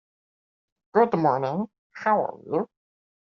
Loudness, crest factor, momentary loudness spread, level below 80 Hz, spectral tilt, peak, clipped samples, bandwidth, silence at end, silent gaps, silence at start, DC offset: -25 LUFS; 20 dB; 10 LU; -72 dBFS; -6.5 dB/octave; -6 dBFS; under 0.1%; 6.8 kHz; 0.6 s; 1.78-1.90 s; 0.95 s; under 0.1%